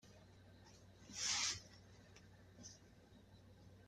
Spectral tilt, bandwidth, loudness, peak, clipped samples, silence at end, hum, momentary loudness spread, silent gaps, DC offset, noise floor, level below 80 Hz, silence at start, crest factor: 0 dB/octave; 15 kHz; -41 LUFS; -28 dBFS; under 0.1%; 0 s; none; 26 LU; none; under 0.1%; -65 dBFS; -74 dBFS; 0.05 s; 24 dB